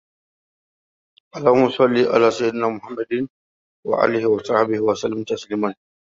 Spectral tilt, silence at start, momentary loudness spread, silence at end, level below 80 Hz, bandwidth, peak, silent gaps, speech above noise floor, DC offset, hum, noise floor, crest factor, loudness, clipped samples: -6 dB/octave; 1.35 s; 11 LU; 0.3 s; -62 dBFS; 7.8 kHz; -2 dBFS; 3.30-3.83 s; over 71 dB; under 0.1%; none; under -90 dBFS; 18 dB; -20 LUFS; under 0.1%